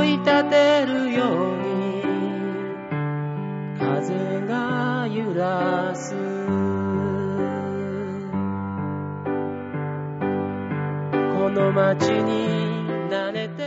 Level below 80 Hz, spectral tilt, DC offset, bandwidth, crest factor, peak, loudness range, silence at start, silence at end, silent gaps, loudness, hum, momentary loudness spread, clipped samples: -54 dBFS; -6.5 dB/octave; under 0.1%; 8 kHz; 16 dB; -6 dBFS; 5 LU; 0 s; 0 s; none; -24 LUFS; none; 9 LU; under 0.1%